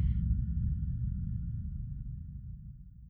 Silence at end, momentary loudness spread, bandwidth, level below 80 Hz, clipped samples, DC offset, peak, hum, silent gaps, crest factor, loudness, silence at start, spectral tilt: 0 s; 14 LU; 2.1 kHz; -36 dBFS; under 0.1%; under 0.1%; -20 dBFS; none; none; 16 dB; -37 LUFS; 0 s; -12 dB/octave